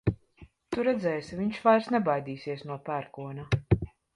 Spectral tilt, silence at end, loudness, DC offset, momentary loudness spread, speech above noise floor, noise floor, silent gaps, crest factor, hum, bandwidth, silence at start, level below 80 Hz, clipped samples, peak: -8 dB/octave; 0.3 s; -29 LUFS; under 0.1%; 13 LU; 27 dB; -56 dBFS; none; 20 dB; none; 11.5 kHz; 0.05 s; -48 dBFS; under 0.1%; -8 dBFS